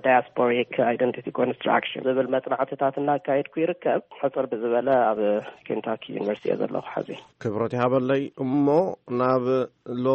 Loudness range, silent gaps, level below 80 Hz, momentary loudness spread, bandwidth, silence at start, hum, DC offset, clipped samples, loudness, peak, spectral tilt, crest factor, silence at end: 2 LU; none; -68 dBFS; 8 LU; 6.8 kHz; 0.05 s; none; under 0.1%; under 0.1%; -25 LUFS; -6 dBFS; -8 dB/octave; 18 dB; 0 s